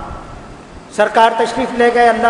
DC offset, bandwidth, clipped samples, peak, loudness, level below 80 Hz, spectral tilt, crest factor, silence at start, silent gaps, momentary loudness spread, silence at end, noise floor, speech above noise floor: under 0.1%; 12 kHz; 0.2%; 0 dBFS; -13 LUFS; -40 dBFS; -4 dB/octave; 14 dB; 0 s; none; 21 LU; 0 s; -35 dBFS; 23 dB